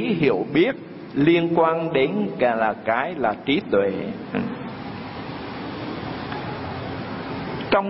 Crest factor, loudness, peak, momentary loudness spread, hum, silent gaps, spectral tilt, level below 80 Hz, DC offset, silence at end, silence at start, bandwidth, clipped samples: 18 dB; -24 LUFS; -4 dBFS; 13 LU; none; none; -11 dB/octave; -54 dBFS; under 0.1%; 0 s; 0 s; 5.8 kHz; under 0.1%